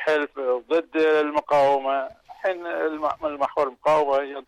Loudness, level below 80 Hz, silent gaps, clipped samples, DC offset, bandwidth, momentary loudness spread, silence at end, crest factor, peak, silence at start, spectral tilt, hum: -23 LUFS; -64 dBFS; none; under 0.1%; under 0.1%; 11 kHz; 8 LU; 0.05 s; 10 dB; -12 dBFS; 0 s; -5 dB/octave; none